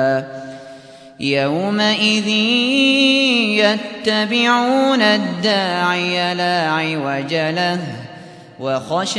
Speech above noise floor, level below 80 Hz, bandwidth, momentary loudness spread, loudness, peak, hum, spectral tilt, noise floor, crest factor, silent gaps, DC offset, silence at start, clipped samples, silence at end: 22 dB; -66 dBFS; 11 kHz; 11 LU; -16 LUFS; -2 dBFS; none; -4 dB/octave; -39 dBFS; 16 dB; none; under 0.1%; 0 s; under 0.1%; 0 s